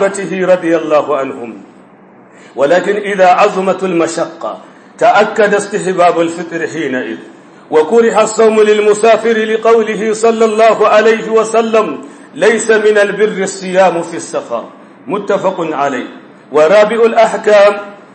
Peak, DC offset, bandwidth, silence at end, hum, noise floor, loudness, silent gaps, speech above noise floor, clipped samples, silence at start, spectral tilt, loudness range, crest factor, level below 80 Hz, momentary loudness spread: 0 dBFS; under 0.1%; 8.8 kHz; 0.2 s; none; -40 dBFS; -11 LUFS; none; 29 dB; under 0.1%; 0 s; -4.5 dB/octave; 4 LU; 12 dB; -68 dBFS; 13 LU